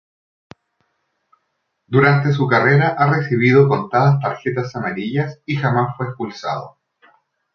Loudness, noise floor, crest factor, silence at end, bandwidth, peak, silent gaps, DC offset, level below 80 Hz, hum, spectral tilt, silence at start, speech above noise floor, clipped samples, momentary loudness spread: -17 LUFS; -72 dBFS; 16 dB; 0.85 s; 6.6 kHz; -2 dBFS; none; under 0.1%; -58 dBFS; none; -8 dB/octave; 1.9 s; 56 dB; under 0.1%; 12 LU